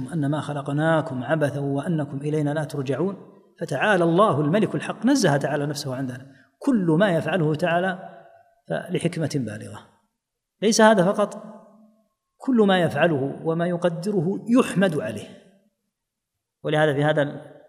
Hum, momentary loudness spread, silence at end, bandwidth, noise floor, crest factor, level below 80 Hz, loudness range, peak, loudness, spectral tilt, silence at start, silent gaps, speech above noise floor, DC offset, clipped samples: none; 12 LU; 0.2 s; 15.5 kHz; -82 dBFS; 20 dB; -70 dBFS; 3 LU; -2 dBFS; -22 LUFS; -6 dB/octave; 0 s; none; 60 dB; under 0.1%; under 0.1%